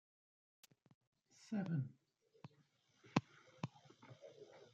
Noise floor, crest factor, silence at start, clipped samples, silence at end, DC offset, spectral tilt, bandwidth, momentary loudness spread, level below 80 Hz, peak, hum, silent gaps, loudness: -76 dBFS; 32 dB; 1.4 s; under 0.1%; 0.1 s; under 0.1%; -7 dB/octave; 8.8 kHz; 21 LU; -90 dBFS; -16 dBFS; none; none; -45 LUFS